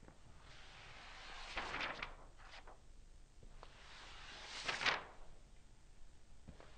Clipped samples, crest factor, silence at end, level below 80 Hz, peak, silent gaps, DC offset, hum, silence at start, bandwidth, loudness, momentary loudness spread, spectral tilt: under 0.1%; 30 dB; 0 s; -60 dBFS; -20 dBFS; none; under 0.1%; none; 0 s; 9.4 kHz; -44 LUFS; 28 LU; -2 dB/octave